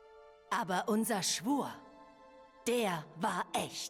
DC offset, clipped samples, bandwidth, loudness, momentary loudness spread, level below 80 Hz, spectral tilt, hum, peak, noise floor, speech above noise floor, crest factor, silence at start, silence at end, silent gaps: under 0.1%; under 0.1%; 17.5 kHz; -35 LUFS; 7 LU; -76 dBFS; -3.5 dB/octave; none; -20 dBFS; -58 dBFS; 24 dB; 16 dB; 0.05 s; 0 s; none